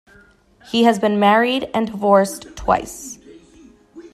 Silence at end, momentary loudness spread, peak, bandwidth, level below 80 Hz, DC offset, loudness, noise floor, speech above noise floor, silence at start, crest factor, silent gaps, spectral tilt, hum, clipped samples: 0.05 s; 18 LU; -2 dBFS; 14.5 kHz; -46 dBFS; under 0.1%; -17 LUFS; -51 dBFS; 34 dB; 0.75 s; 18 dB; none; -4.5 dB/octave; none; under 0.1%